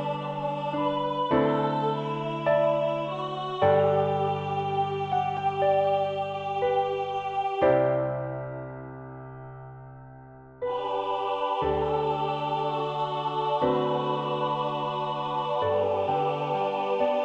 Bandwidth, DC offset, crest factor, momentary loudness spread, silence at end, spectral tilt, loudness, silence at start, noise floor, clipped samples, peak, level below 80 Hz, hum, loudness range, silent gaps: 7.8 kHz; under 0.1%; 16 dB; 13 LU; 0 s; -7.5 dB/octave; -27 LUFS; 0 s; -47 dBFS; under 0.1%; -10 dBFS; -58 dBFS; none; 5 LU; none